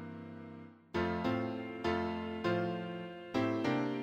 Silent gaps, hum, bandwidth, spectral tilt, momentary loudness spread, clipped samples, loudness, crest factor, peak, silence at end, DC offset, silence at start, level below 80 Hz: none; none; 8.8 kHz; -7 dB/octave; 14 LU; under 0.1%; -36 LUFS; 16 dB; -20 dBFS; 0 s; under 0.1%; 0 s; -62 dBFS